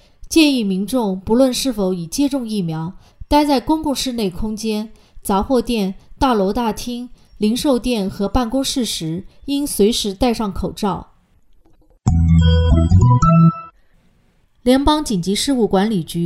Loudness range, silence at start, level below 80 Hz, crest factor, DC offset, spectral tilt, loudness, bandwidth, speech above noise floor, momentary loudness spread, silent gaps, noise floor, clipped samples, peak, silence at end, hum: 5 LU; 0.2 s; -30 dBFS; 18 dB; under 0.1%; -6 dB/octave; -17 LUFS; 15.5 kHz; 39 dB; 11 LU; none; -56 dBFS; under 0.1%; 0 dBFS; 0 s; none